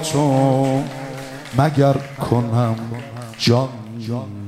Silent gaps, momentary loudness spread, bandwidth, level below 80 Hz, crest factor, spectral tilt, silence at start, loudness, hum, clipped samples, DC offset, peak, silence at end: none; 15 LU; 15 kHz; -52 dBFS; 18 dB; -6.5 dB/octave; 0 s; -19 LUFS; none; under 0.1%; under 0.1%; 0 dBFS; 0 s